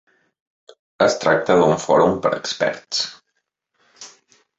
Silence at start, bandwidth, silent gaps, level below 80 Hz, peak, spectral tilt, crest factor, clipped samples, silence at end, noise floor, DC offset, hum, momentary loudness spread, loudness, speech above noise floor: 1 s; 8 kHz; none; -56 dBFS; -2 dBFS; -4 dB/octave; 20 dB; under 0.1%; 0.5 s; -74 dBFS; under 0.1%; none; 17 LU; -18 LUFS; 57 dB